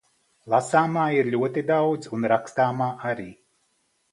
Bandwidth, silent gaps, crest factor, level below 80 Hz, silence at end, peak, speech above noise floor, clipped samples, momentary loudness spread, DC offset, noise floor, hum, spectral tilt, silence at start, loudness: 11.5 kHz; none; 20 dB; -68 dBFS; 0.8 s; -4 dBFS; 47 dB; under 0.1%; 9 LU; under 0.1%; -70 dBFS; none; -6.5 dB/octave; 0.45 s; -24 LUFS